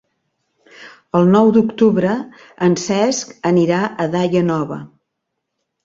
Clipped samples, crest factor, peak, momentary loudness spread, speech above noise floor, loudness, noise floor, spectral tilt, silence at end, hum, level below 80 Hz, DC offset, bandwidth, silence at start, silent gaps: under 0.1%; 16 dB; -2 dBFS; 10 LU; 61 dB; -16 LUFS; -76 dBFS; -6 dB/octave; 1 s; none; -58 dBFS; under 0.1%; 7.8 kHz; 0.8 s; none